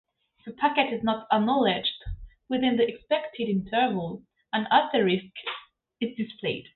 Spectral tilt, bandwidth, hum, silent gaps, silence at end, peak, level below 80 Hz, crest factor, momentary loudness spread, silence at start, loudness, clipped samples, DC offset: -9.5 dB/octave; 4.4 kHz; none; none; 0.15 s; -6 dBFS; -50 dBFS; 20 dB; 16 LU; 0.45 s; -26 LUFS; under 0.1%; under 0.1%